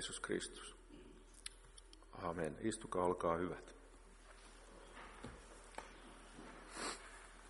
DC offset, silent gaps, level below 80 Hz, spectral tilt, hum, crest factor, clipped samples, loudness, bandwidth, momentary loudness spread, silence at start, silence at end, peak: under 0.1%; none; -62 dBFS; -4 dB/octave; none; 24 dB; under 0.1%; -45 LUFS; 11.5 kHz; 21 LU; 0 s; 0 s; -22 dBFS